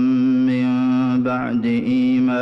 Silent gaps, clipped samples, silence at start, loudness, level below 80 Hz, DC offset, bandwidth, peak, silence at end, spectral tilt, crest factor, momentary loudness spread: none; under 0.1%; 0 s; -18 LUFS; -58 dBFS; under 0.1%; 6 kHz; -12 dBFS; 0 s; -8.5 dB/octave; 6 dB; 3 LU